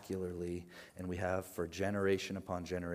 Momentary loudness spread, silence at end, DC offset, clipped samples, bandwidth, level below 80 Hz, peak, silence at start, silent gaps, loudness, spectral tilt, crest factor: 10 LU; 0 s; under 0.1%; under 0.1%; 15.5 kHz; -70 dBFS; -22 dBFS; 0 s; none; -39 LUFS; -6 dB/octave; 18 dB